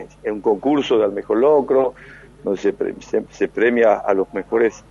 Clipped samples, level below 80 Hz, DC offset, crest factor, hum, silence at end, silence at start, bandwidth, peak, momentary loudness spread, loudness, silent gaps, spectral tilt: under 0.1%; -52 dBFS; under 0.1%; 14 dB; 50 Hz at -50 dBFS; 0.1 s; 0 s; 7.4 kHz; -4 dBFS; 9 LU; -19 LUFS; none; -6 dB/octave